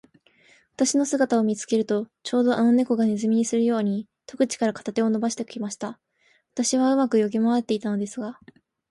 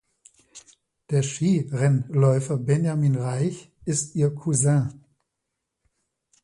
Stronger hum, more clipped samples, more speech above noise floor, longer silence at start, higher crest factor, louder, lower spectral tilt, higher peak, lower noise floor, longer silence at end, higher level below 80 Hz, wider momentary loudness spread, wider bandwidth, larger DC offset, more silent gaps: neither; neither; second, 42 dB vs 59 dB; first, 0.8 s vs 0.55 s; about the same, 14 dB vs 18 dB; about the same, -23 LUFS vs -23 LUFS; second, -4.5 dB/octave vs -6.5 dB/octave; about the same, -10 dBFS vs -8 dBFS; second, -65 dBFS vs -81 dBFS; second, 0.55 s vs 1.45 s; second, -70 dBFS vs -60 dBFS; first, 11 LU vs 7 LU; about the same, 11.5 kHz vs 11.5 kHz; neither; neither